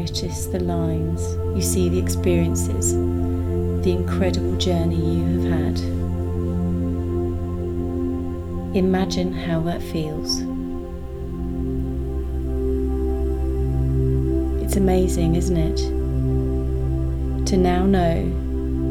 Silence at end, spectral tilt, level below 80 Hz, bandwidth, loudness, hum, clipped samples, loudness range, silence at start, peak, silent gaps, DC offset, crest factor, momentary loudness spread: 0 s; -6.5 dB/octave; -28 dBFS; 16 kHz; -22 LUFS; none; under 0.1%; 4 LU; 0 s; -6 dBFS; none; under 0.1%; 14 dB; 7 LU